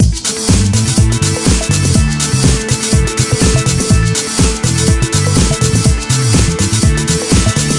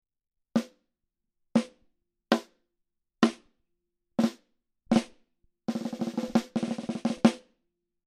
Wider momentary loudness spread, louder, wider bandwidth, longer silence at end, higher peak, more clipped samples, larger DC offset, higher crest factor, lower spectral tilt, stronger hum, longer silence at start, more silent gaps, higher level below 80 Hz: second, 2 LU vs 14 LU; first, -12 LUFS vs -30 LUFS; about the same, 11.5 kHz vs 12.5 kHz; second, 0 s vs 0.7 s; first, 0 dBFS vs -6 dBFS; neither; neither; second, 12 dB vs 26 dB; about the same, -4.5 dB/octave vs -5.5 dB/octave; neither; second, 0 s vs 0.55 s; neither; first, -20 dBFS vs -68 dBFS